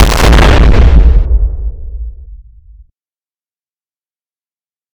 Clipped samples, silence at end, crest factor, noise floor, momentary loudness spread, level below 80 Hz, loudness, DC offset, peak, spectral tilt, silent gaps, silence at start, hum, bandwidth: 3%; 2.55 s; 10 dB; under -90 dBFS; 19 LU; -10 dBFS; -8 LUFS; under 0.1%; 0 dBFS; -5.5 dB/octave; none; 0 s; none; 15.5 kHz